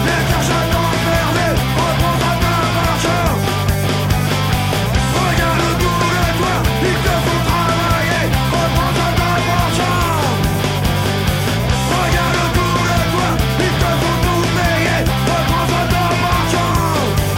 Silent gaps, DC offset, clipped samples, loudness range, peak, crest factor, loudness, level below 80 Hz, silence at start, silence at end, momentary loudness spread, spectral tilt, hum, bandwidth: none; under 0.1%; under 0.1%; 1 LU; -4 dBFS; 12 dB; -15 LUFS; -26 dBFS; 0 s; 0 s; 2 LU; -5 dB/octave; none; 16.5 kHz